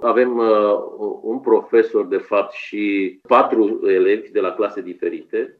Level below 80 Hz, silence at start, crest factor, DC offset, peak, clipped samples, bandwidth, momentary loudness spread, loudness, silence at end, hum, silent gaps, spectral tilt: -70 dBFS; 0 s; 16 dB; under 0.1%; -2 dBFS; under 0.1%; 6 kHz; 10 LU; -18 LUFS; 0.1 s; none; none; -7 dB/octave